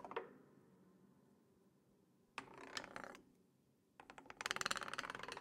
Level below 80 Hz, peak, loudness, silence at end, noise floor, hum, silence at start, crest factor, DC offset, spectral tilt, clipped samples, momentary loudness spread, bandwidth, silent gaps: -82 dBFS; -18 dBFS; -47 LUFS; 0 s; -77 dBFS; none; 0 s; 34 dB; under 0.1%; -1.5 dB/octave; under 0.1%; 22 LU; 16 kHz; none